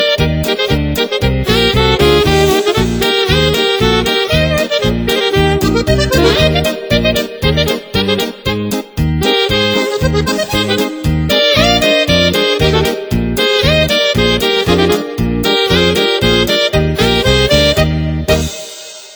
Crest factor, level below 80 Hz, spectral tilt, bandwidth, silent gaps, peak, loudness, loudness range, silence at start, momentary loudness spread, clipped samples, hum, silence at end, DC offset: 12 dB; -24 dBFS; -4.5 dB/octave; over 20 kHz; none; 0 dBFS; -12 LUFS; 3 LU; 0 s; 6 LU; under 0.1%; none; 0 s; under 0.1%